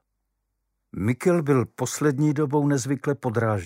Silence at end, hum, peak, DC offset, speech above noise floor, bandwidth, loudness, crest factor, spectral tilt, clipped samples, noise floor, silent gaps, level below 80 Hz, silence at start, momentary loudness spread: 0 s; none; -8 dBFS; under 0.1%; 54 dB; 16 kHz; -24 LUFS; 16 dB; -6.5 dB/octave; under 0.1%; -77 dBFS; none; -60 dBFS; 0.95 s; 6 LU